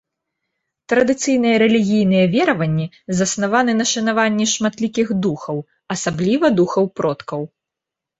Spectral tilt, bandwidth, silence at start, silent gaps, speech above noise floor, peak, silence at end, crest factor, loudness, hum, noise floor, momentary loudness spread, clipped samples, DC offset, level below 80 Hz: -4.5 dB/octave; 8.2 kHz; 0.9 s; none; 68 dB; -2 dBFS; 0.75 s; 16 dB; -18 LUFS; none; -85 dBFS; 11 LU; under 0.1%; under 0.1%; -56 dBFS